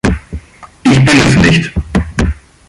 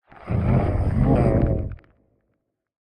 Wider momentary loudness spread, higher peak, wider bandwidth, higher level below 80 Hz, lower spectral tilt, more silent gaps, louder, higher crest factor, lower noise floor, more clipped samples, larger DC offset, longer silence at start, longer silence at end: first, 14 LU vs 9 LU; first, 0 dBFS vs -6 dBFS; first, 11.5 kHz vs 9 kHz; first, -22 dBFS vs -30 dBFS; second, -5.5 dB/octave vs -10.5 dB/octave; neither; first, -10 LUFS vs -22 LUFS; about the same, 12 dB vs 16 dB; second, -30 dBFS vs -74 dBFS; neither; neither; second, 0.05 s vs 0.2 s; second, 0.35 s vs 1.1 s